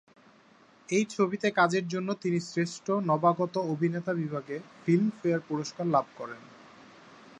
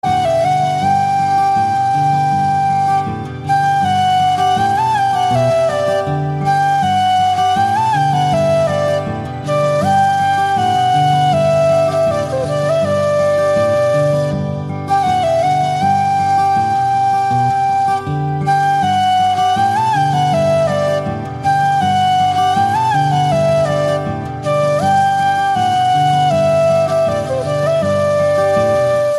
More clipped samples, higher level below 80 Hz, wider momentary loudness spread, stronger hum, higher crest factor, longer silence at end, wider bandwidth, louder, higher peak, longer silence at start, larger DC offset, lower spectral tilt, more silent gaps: neither; second, -76 dBFS vs -48 dBFS; first, 10 LU vs 4 LU; neither; first, 20 dB vs 10 dB; first, 0.25 s vs 0 s; second, 9.8 kHz vs 12.5 kHz; second, -29 LUFS vs -14 LUFS; second, -10 dBFS vs -2 dBFS; first, 0.9 s vs 0.05 s; neither; about the same, -6 dB/octave vs -5.5 dB/octave; neither